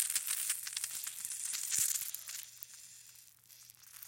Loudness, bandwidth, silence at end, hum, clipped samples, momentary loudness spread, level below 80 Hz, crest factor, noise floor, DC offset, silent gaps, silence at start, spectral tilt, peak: -35 LUFS; 17 kHz; 0 s; none; under 0.1%; 24 LU; -82 dBFS; 28 dB; -59 dBFS; under 0.1%; none; 0 s; 3.5 dB/octave; -12 dBFS